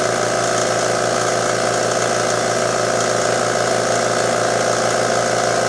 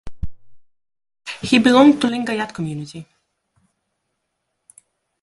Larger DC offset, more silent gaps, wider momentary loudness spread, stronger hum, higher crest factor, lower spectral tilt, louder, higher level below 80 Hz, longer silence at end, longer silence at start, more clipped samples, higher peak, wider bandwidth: neither; neither; second, 1 LU vs 24 LU; neither; second, 14 dB vs 20 dB; second, -3 dB/octave vs -5 dB/octave; about the same, -17 LUFS vs -16 LUFS; about the same, -48 dBFS vs -44 dBFS; second, 0 s vs 2.2 s; about the same, 0 s vs 0.05 s; neither; second, -4 dBFS vs 0 dBFS; about the same, 11 kHz vs 11.5 kHz